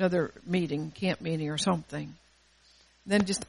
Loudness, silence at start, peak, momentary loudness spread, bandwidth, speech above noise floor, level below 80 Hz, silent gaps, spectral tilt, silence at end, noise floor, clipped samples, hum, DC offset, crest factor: -31 LUFS; 0 s; -12 dBFS; 12 LU; 11.5 kHz; 33 dB; -60 dBFS; none; -5 dB/octave; 0.05 s; -62 dBFS; under 0.1%; none; under 0.1%; 18 dB